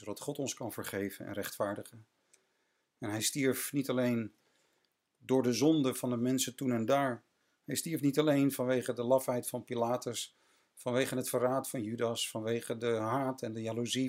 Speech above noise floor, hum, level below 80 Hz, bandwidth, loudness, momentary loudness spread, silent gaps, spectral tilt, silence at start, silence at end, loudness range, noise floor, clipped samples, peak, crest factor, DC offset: 45 dB; none; -80 dBFS; 16 kHz; -33 LUFS; 11 LU; none; -4.5 dB/octave; 0 s; 0 s; 4 LU; -78 dBFS; under 0.1%; -16 dBFS; 18 dB; under 0.1%